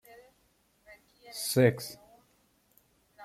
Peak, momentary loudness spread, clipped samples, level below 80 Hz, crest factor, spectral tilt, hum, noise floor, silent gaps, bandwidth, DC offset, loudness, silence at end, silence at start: -10 dBFS; 20 LU; under 0.1%; -70 dBFS; 24 dB; -5 dB/octave; none; -70 dBFS; none; 16 kHz; under 0.1%; -29 LUFS; 0 s; 0.9 s